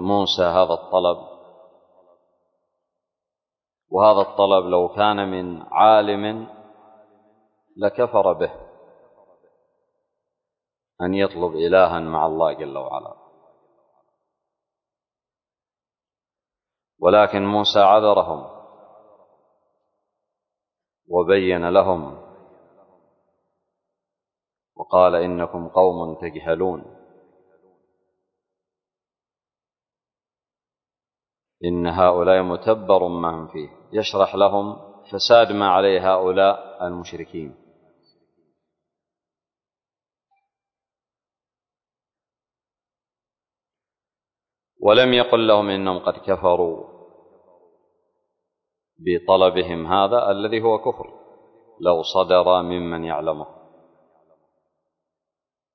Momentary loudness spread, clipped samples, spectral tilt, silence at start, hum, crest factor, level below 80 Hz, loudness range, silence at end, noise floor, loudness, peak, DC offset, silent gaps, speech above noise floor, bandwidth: 16 LU; under 0.1%; -6 dB/octave; 0 s; none; 20 dB; -52 dBFS; 9 LU; 2.25 s; under -90 dBFS; -19 LUFS; -2 dBFS; under 0.1%; none; over 72 dB; 6.4 kHz